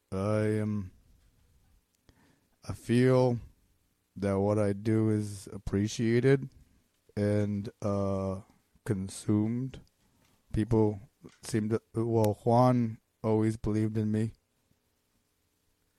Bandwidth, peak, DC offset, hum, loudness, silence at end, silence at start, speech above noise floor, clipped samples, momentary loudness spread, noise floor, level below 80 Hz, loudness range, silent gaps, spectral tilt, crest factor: 14 kHz; -12 dBFS; under 0.1%; none; -30 LUFS; 1.65 s; 0.1 s; 46 dB; under 0.1%; 15 LU; -75 dBFS; -54 dBFS; 4 LU; none; -7.5 dB/octave; 20 dB